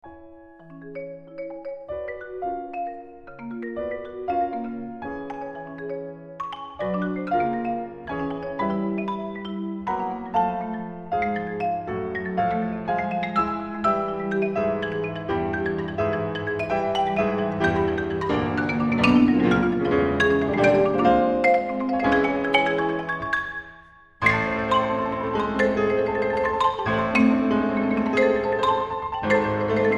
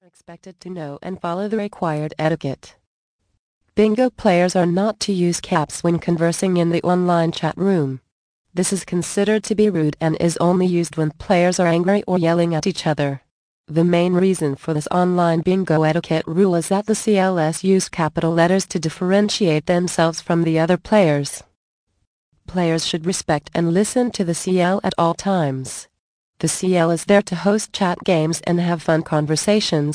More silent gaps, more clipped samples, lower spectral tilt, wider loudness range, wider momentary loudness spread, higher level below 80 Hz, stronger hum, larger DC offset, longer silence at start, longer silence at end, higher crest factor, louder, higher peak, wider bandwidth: second, none vs 2.87-3.19 s, 3.39-3.61 s, 8.12-8.45 s, 13.31-13.64 s, 21.56-21.87 s, 22.07-22.32 s, 25.99-26.33 s; neither; first, -7 dB/octave vs -5.5 dB/octave; first, 11 LU vs 3 LU; first, 14 LU vs 7 LU; about the same, -48 dBFS vs -52 dBFS; neither; neither; second, 0.05 s vs 0.3 s; about the same, 0 s vs 0 s; about the same, 20 dB vs 16 dB; second, -24 LUFS vs -19 LUFS; about the same, -4 dBFS vs -2 dBFS; about the same, 10 kHz vs 10.5 kHz